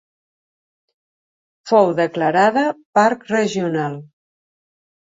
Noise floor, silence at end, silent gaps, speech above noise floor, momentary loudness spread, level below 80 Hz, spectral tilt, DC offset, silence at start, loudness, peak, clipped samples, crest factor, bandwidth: under -90 dBFS; 1 s; 2.85-2.93 s; over 73 dB; 8 LU; -66 dBFS; -5.5 dB/octave; under 0.1%; 1.65 s; -17 LUFS; -2 dBFS; under 0.1%; 18 dB; 7.8 kHz